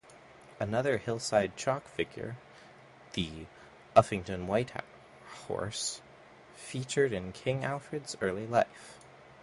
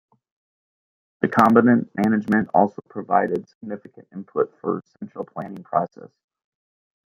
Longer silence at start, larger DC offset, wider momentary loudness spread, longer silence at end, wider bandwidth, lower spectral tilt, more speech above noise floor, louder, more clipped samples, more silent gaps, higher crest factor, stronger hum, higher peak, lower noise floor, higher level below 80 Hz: second, 0.1 s vs 1.25 s; neither; about the same, 19 LU vs 19 LU; second, 0.1 s vs 1.1 s; about the same, 11.5 kHz vs 11 kHz; second, -4.5 dB/octave vs -8.5 dB/octave; second, 23 dB vs over 69 dB; second, -33 LUFS vs -21 LUFS; neither; second, none vs 3.55-3.61 s; first, 28 dB vs 22 dB; neither; second, -6 dBFS vs -2 dBFS; second, -55 dBFS vs under -90 dBFS; first, -60 dBFS vs -66 dBFS